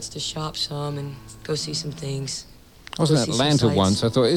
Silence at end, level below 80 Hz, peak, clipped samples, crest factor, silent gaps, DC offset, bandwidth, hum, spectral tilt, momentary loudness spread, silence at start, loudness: 0 s; -50 dBFS; -6 dBFS; under 0.1%; 16 dB; none; 0.1%; 16.5 kHz; none; -5 dB/octave; 14 LU; 0 s; -23 LUFS